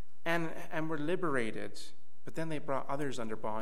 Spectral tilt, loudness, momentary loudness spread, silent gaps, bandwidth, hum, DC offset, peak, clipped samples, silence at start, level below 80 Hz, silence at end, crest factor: -5.5 dB/octave; -37 LUFS; 12 LU; none; 15.5 kHz; none; 3%; -18 dBFS; under 0.1%; 0.25 s; -72 dBFS; 0 s; 20 dB